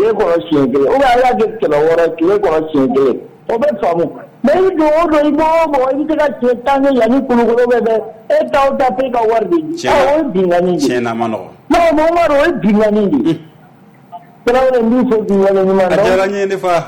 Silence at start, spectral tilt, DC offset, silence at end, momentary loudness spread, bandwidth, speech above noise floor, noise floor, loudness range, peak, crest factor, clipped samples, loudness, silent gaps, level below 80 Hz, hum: 0 s; -6.5 dB/octave; under 0.1%; 0 s; 5 LU; 19 kHz; 30 dB; -42 dBFS; 1 LU; -6 dBFS; 8 dB; under 0.1%; -13 LUFS; none; -40 dBFS; none